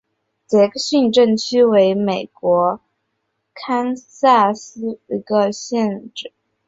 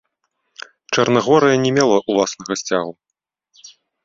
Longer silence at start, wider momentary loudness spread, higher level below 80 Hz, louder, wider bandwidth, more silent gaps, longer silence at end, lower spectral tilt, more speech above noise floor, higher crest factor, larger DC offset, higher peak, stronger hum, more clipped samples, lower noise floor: second, 0.5 s vs 0.9 s; second, 15 LU vs 20 LU; about the same, -62 dBFS vs -58 dBFS; about the same, -17 LUFS vs -17 LUFS; about the same, 8 kHz vs 7.8 kHz; neither; about the same, 0.4 s vs 0.4 s; about the same, -5 dB/octave vs -4.5 dB/octave; second, 56 dB vs 65 dB; about the same, 16 dB vs 18 dB; neither; about the same, -2 dBFS vs -2 dBFS; neither; neither; second, -72 dBFS vs -81 dBFS